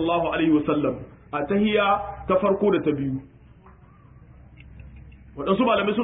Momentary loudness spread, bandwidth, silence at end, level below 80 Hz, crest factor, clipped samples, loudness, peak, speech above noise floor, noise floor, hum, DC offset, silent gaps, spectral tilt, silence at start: 12 LU; 4 kHz; 0 s; -48 dBFS; 16 dB; under 0.1%; -23 LUFS; -8 dBFS; 28 dB; -50 dBFS; none; under 0.1%; none; -11 dB/octave; 0 s